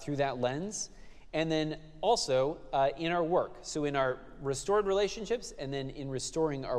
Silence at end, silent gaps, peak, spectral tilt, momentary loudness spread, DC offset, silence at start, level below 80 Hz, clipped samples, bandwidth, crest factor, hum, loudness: 0 s; none; -16 dBFS; -4.5 dB/octave; 9 LU; under 0.1%; 0 s; -52 dBFS; under 0.1%; 13 kHz; 16 dB; none; -32 LUFS